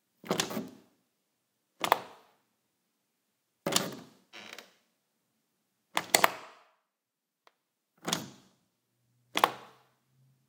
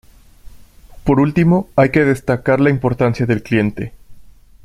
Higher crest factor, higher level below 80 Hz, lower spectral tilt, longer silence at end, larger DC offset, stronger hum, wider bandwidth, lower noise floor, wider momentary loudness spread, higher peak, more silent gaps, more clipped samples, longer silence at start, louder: first, 38 dB vs 16 dB; second, -84 dBFS vs -40 dBFS; second, -2 dB/octave vs -8.5 dB/octave; first, 0.85 s vs 0.35 s; neither; neither; first, 18 kHz vs 14.5 kHz; first, -87 dBFS vs -40 dBFS; first, 23 LU vs 8 LU; about the same, 0 dBFS vs 0 dBFS; neither; neither; second, 0.25 s vs 0.45 s; second, -31 LUFS vs -15 LUFS